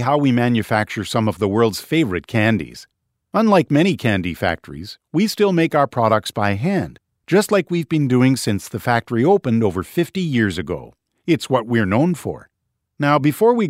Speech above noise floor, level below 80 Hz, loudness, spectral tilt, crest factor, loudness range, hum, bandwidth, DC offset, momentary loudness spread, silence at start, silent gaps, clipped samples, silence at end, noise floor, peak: 57 dB; -52 dBFS; -18 LUFS; -6.5 dB/octave; 18 dB; 2 LU; none; 16 kHz; under 0.1%; 9 LU; 0 s; none; under 0.1%; 0 s; -75 dBFS; -2 dBFS